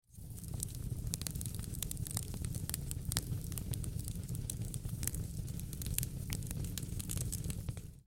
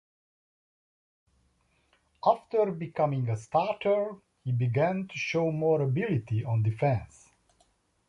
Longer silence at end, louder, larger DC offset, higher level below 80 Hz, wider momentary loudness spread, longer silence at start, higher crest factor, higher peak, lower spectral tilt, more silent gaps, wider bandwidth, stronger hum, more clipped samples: second, 0.05 s vs 1.05 s; second, -41 LUFS vs -29 LUFS; neither; first, -46 dBFS vs -60 dBFS; about the same, 5 LU vs 5 LU; second, 0.1 s vs 2.25 s; first, 32 dB vs 20 dB; about the same, -8 dBFS vs -10 dBFS; second, -4 dB/octave vs -7.5 dB/octave; neither; first, 17 kHz vs 10 kHz; neither; neither